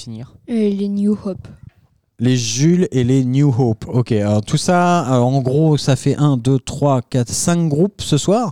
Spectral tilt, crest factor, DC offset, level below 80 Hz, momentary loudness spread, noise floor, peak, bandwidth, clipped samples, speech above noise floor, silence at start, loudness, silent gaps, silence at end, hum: -6 dB/octave; 12 dB; 0.5%; -46 dBFS; 5 LU; -57 dBFS; -4 dBFS; 14 kHz; under 0.1%; 41 dB; 0 s; -16 LUFS; none; 0 s; none